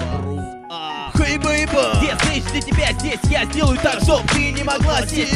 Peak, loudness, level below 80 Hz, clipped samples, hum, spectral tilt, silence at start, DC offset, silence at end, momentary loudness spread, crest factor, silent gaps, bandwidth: -2 dBFS; -18 LUFS; -26 dBFS; under 0.1%; none; -4.5 dB/octave; 0 s; 0.1%; 0 s; 10 LU; 16 dB; none; 14 kHz